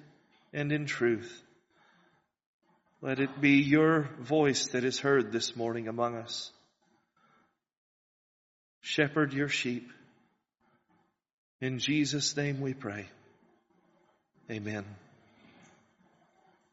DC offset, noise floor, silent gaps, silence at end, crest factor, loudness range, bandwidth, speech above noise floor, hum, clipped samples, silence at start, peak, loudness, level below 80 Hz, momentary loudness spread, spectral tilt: under 0.1%; -73 dBFS; 2.46-2.60 s, 7.77-8.81 s, 11.33-11.59 s; 1.75 s; 22 dB; 13 LU; 8 kHz; 43 dB; none; under 0.1%; 0.55 s; -10 dBFS; -30 LUFS; -74 dBFS; 16 LU; -4 dB/octave